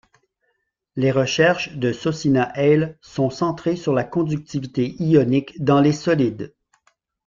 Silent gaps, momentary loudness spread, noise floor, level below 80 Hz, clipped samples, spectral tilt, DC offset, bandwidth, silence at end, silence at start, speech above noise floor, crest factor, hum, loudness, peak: none; 8 LU; -72 dBFS; -56 dBFS; under 0.1%; -6.5 dB/octave; under 0.1%; 7.6 kHz; 0.8 s; 0.95 s; 53 dB; 18 dB; none; -20 LUFS; -2 dBFS